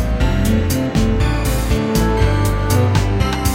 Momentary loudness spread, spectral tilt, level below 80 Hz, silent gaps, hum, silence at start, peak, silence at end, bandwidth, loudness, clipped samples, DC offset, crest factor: 3 LU; -6 dB/octave; -20 dBFS; none; none; 0 s; -2 dBFS; 0 s; 16.5 kHz; -17 LUFS; under 0.1%; under 0.1%; 12 dB